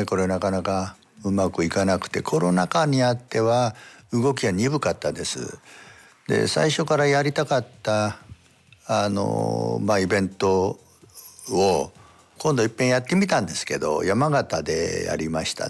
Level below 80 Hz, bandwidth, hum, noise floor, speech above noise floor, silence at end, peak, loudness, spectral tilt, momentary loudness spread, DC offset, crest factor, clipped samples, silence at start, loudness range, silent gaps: -58 dBFS; 12 kHz; none; -55 dBFS; 32 dB; 0 s; -8 dBFS; -23 LUFS; -5 dB/octave; 8 LU; under 0.1%; 14 dB; under 0.1%; 0 s; 2 LU; none